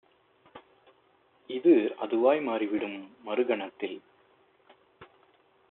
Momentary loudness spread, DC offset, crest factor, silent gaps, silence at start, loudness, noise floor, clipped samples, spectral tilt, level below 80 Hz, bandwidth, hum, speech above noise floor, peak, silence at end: 15 LU; under 0.1%; 20 dB; none; 0.55 s; -28 LUFS; -65 dBFS; under 0.1%; -3.5 dB/octave; -80 dBFS; 4 kHz; none; 38 dB; -10 dBFS; 0.65 s